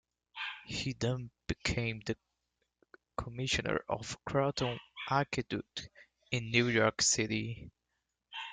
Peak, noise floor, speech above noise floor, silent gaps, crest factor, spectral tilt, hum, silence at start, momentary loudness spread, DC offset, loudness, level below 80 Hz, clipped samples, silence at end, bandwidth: -12 dBFS; -85 dBFS; 51 dB; none; 24 dB; -3.5 dB/octave; none; 0.35 s; 16 LU; under 0.1%; -34 LUFS; -56 dBFS; under 0.1%; 0 s; 9.6 kHz